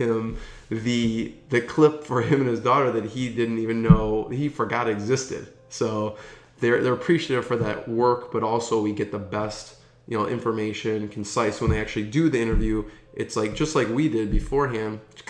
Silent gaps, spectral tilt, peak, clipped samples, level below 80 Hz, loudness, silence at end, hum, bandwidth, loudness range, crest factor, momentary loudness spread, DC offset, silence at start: none; -6 dB/octave; 0 dBFS; under 0.1%; -36 dBFS; -24 LUFS; 0 s; none; 10.5 kHz; 4 LU; 24 dB; 10 LU; under 0.1%; 0 s